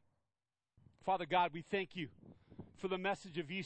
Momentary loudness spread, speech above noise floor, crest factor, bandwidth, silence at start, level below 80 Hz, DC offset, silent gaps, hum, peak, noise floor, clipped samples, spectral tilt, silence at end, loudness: 19 LU; over 51 dB; 22 dB; 8.4 kHz; 1.05 s; -74 dBFS; under 0.1%; none; none; -20 dBFS; under -90 dBFS; under 0.1%; -5.5 dB/octave; 0 s; -39 LUFS